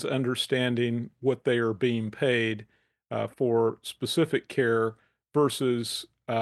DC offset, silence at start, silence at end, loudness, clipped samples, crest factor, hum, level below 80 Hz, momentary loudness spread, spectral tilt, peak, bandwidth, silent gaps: under 0.1%; 0 s; 0 s; -27 LUFS; under 0.1%; 14 dB; none; -74 dBFS; 8 LU; -5.5 dB/octave; -12 dBFS; 12.5 kHz; none